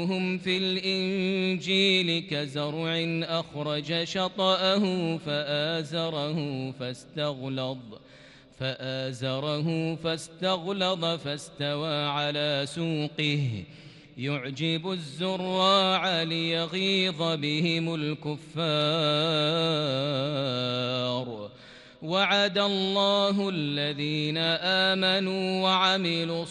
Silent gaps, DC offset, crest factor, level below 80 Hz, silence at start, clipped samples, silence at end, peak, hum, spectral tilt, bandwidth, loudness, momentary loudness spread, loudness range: none; under 0.1%; 18 dB; -68 dBFS; 0 s; under 0.1%; 0 s; -10 dBFS; none; -5 dB/octave; 11.5 kHz; -27 LUFS; 10 LU; 6 LU